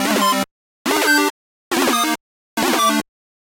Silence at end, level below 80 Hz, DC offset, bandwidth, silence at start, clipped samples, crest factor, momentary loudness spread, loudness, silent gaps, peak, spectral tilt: 0.4 s; -62 dBFS; under 0.1%; 16.5 kHz; 0 s; under 0.1%; 18 dB; 12 LU; -18 LUFS; 0.51-0.85 s, 1.30-1.71 s, 2.20-2.57 s; -2 dBFS; -2 dB/octave